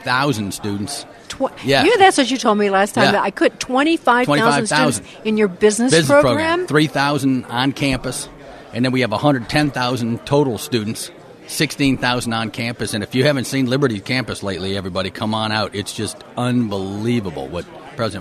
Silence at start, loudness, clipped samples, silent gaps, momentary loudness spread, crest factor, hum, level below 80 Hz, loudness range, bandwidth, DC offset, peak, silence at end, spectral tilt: 0 s; -18 LUFS; under 0.1%; none; 11 LU; 18 dB; none; -46 dBFS; 6 LU; 13.5 kHz; under 0.1%; 0 dBFS; 0 s; -4.5 dB/octave